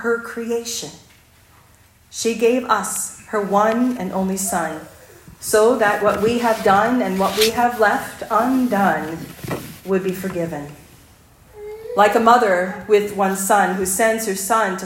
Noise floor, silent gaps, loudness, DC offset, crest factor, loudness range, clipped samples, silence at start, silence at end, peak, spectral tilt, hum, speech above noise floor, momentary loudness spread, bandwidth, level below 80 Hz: -51 dBFS; none; -18 LUFS; under 0.1%; 18 dB; 6 LU; under 0.1%; 0 s; 0 s; 0 dBFS; -4 dB/octave; none; 33 dB; 13 LU; 16.5 kHz; -54 dBFS